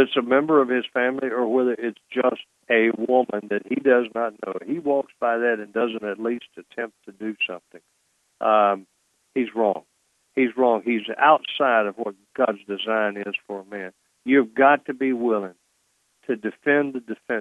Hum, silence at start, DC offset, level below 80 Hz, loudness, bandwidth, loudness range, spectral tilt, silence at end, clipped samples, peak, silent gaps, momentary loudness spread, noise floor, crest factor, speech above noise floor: none; 0 s; under 0.1%; -78 dBFS; -23 LUFS; 10 kHz; 4 LU; -6.5 dB/octave; 0 s; under 0.1%; -4 dBFS; none; 14 LU; -68 dBFS; 18 dB; 46 dB